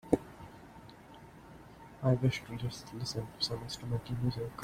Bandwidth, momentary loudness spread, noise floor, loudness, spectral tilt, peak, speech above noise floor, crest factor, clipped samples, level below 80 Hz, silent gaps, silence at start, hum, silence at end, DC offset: 15.5 kHz; 22 LU; -54 dBFS; -35 LUFS; -6 dB/octave; 0 dBFS; 21 dB; 34 dB; under 0.1%; -58 dBFS; none; 0.05 s; none; 0 s; under 0.1%